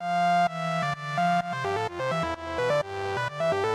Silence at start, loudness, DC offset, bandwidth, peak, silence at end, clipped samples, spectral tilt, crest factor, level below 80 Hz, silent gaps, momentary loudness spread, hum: 0 s; -27 LUFS; under 0.1%; 13 kHz; -14 dBFS; 0 s; under 0.1%; -5.5 dB/octave; 12 dB; -58 dBFS; none; 6 LU; none